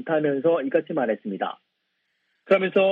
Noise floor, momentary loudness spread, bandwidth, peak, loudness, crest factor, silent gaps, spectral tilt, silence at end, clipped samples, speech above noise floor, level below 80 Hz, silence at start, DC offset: -75 dBFS; 10 LU; 4.8 kHz; -6 dBFS; -24 LUFS; 18 dB; none; -8.5 dB/octave; 0 s; under 0.1%; 52 dB; -74 dBFS; 0 s; under 0.1%